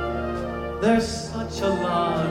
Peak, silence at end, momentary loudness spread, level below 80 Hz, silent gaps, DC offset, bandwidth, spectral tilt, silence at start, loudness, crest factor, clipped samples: -8 dBFS; 0 s; 8 LU; -40 dBFS; none; under 0.1%; 15 kHz; -5.5 dB/octave; 0 s; -24 LUFS; 16 dB; under 0.1%